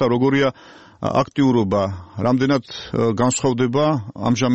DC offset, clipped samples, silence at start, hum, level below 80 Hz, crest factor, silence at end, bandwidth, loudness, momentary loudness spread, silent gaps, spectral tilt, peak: 0.2%; under 0.1%; 0 s; none; -50 dBFS; 16 dB; 0 s; 8.4 kHz; -19 LUFS; 6 LU; none; -6 dB/octave; -4 dBFS